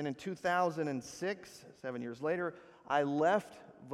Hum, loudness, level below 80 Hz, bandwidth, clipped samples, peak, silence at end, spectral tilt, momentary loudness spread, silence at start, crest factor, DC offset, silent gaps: none; -35 LUFS; -76 dBFS; 14 kHz; under 0.1%; -18 dBFS; 0 s; -5.5 dB/octave; 15 LU; 0 s; 18 dB; under 0.1%; none